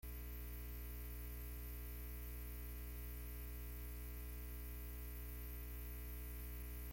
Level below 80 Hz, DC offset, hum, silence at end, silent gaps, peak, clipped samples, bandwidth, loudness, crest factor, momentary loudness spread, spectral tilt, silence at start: -50 dBFS; under 0.1%; 60 Hz at -50 dBFS; 0 s; none; -40 dBFS; under 0.1%; 17 kHz; -51 LUFS; 10 dB; 0 LU; -5 dB/octave; 0.05 s